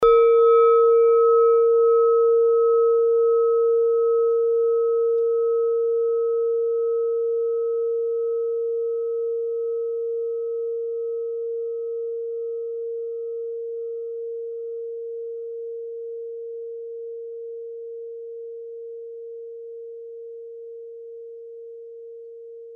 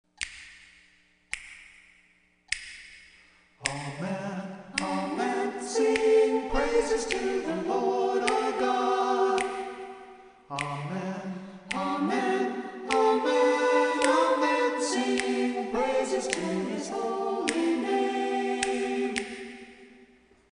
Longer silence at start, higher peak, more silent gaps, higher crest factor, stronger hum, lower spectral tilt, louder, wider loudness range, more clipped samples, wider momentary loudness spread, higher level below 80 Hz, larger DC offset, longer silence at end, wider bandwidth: second, 0 s vs 0.2 s; about the same, -8 dBFS vs -6 dBFS; neither; second, 14 dB vs 22 dB; neither; first, -5.5 dB/octave vs -4 dB/octave; first, -21 LUFS vs -28 LUFS; first, 19 LU vs 11 LU; neither; first, 22 LU vs 15 LU; second, -62 dBFS vs -52 dBFS; neither; second, 0 s vs 0.65 s; second, 3.7 kHz vs 10.5 kHz